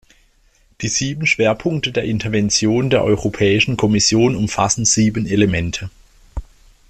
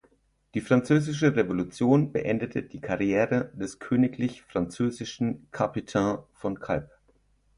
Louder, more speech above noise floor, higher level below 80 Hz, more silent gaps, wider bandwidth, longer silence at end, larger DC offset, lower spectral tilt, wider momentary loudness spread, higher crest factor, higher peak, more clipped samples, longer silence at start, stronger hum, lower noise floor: first, -16 LUFS vs -27 LUFS; about the same, 39 dB vs 39 dB; first, -40 dBFS vs -56 dBFS; neither; about the same, 12 kHz vs 11 kHz; second, 0.45 s vs 0.7 s; neither; second, -4 dB/octave vs -7 dB/octave; about the same, 13 LU vs 11 LU; about the same, 16 dB vs 20 dB; first, -2 dBFS vs -6 dBFS; neither; first, 0.8 s vs 0.55 s; neither; second, -55 dBFS vs -65 dBFS